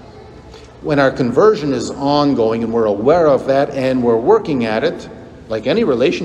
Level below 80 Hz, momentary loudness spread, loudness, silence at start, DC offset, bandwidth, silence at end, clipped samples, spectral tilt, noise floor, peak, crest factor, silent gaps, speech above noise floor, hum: -46 dBFS; 8 LU; -15 LUFS; 0 s; under 0.1%; 10 kHz; 0 s; under 0.1%; -6.5 dB/octave; -37 dBFS; 0 dBFS; 14 dB; none; 23 dB; none